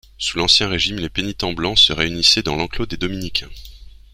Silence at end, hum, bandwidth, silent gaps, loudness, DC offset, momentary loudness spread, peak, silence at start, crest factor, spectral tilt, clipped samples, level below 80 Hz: 0.25 s; none; 16 kHz; none; -17 LUFS; under 0.1%; 11 LU; 0 dBFS; 0.2 s; 20 dB; -3 dB/octave; under 0.1%; -36 dBFS